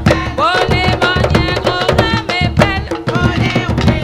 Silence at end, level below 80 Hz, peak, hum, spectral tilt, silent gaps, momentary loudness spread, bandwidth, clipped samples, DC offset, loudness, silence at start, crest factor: 0 s; -24 dBFS; 0 dBFS; none; -6 dB/octave; none; 3 LU; 15 kHz; 0.2%; under 0.1%; -13 LUFS; 0 s; 14 dB